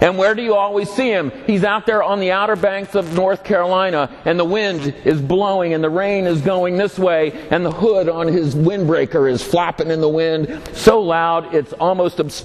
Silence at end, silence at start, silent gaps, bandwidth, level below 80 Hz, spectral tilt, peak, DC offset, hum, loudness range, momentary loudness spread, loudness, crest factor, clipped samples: 0 s; 0 s; none; 14 kHz; -46 dBFS; -6 dB/octave; 0 dBFS; under 0.1%; none; 1 LU; 4 LU; -17 LUFS; 16 dB; under 0.1%